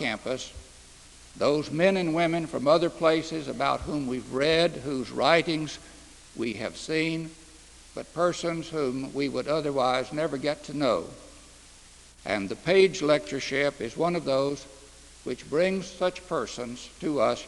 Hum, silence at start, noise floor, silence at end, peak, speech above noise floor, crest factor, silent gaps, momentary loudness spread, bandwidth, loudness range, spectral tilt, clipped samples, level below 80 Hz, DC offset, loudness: none; 0 s; -52 dBFS; 0 s; -4 dBFS; 25 dB; 24 dB; none; 15 LU; 12 kHz; 4 LU; -5 dB/octave; under 0.1%; -54 dBFS; under 0.1%; -27 LUFS